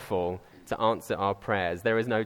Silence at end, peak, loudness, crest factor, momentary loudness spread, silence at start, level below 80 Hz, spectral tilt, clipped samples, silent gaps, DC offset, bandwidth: 0 s; -10 dBFS; -29 LUFS; 18 dB; 8 LU; 0 s; -58 dBFS; -6 dB/octave; under 0.1%; none; under 0.1%; 18.5 kHz